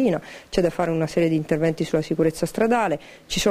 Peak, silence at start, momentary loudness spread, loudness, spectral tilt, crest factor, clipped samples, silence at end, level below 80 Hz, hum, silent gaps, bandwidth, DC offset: -6 dBFS; 0 s; 6 LU; -23 LUFS; -5.5 dB/octave; 16 dB; under 0.1%; 0 s; -46 dBFS; none; none; 15.5 kHz; under 0.1%